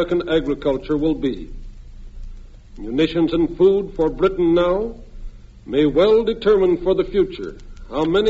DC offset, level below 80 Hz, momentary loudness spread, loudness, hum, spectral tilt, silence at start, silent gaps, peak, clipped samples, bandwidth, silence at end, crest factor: under 0.1%; -36 dBFS; 14 LU; -19 LUFS; none; -5.5 dB/octave; 0 s; none; -4 dBFS; under 0.1%; 7.8 kHz; 0 s; 14 dB